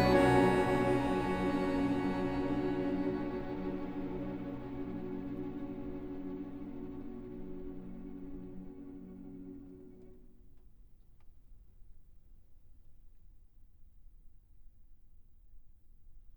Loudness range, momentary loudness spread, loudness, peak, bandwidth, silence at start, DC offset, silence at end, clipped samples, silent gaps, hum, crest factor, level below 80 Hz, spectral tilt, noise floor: 20 LU; 19 LU; -35 LUFS; -14 dBFS; over 20 kHz; 0 s; 0.1%; 0 s; under 0.1%; none; none; 22 dB; -52 dBFS; -7 dB/octave; -57 dBFS